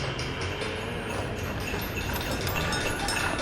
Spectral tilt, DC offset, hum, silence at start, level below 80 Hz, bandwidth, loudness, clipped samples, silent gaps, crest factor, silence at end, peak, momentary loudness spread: -4 dB/octave; under 0.1%; none; 0 s; -42 dBFS; 18 kHz; -30 LUFS; under 0.1%; none; 16 dB; 0 s; -14 dBFS; 5 LU